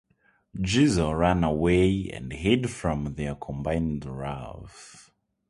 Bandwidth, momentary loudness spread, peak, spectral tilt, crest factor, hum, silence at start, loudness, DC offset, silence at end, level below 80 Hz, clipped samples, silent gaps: 11.5 kHz; 18 LU; -6 dBFS; -6 dB/octave; 20 dB; none; 0.55 s; -26 LUFS; under 0.1%; 0.5 s; -40 dBFS; under 0.1%; none